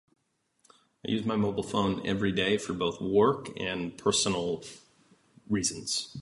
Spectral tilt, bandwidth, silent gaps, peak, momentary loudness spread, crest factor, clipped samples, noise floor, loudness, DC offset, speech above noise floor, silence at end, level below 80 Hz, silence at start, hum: -4 dB/octave; 11.5 kHz; none; -12 dBFS; 8 LU; 18 dB; under 0.1%; -70 dBFS; -29 LUFS; under 0.1%; 41 dB; 0 s; -58 dBFS; 1.05 s; none